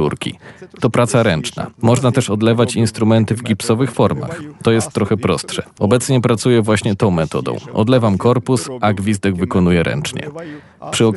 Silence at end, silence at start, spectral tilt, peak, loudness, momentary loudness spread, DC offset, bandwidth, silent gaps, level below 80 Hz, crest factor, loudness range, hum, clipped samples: 0 s; 0 s; -6 dB/octave; -2 dBFS; -16 LUFS; 10 LU; under 0.1%; 12 kHz; none; -48 dBFS; 14 dB; 1 LU; none; under 0.1%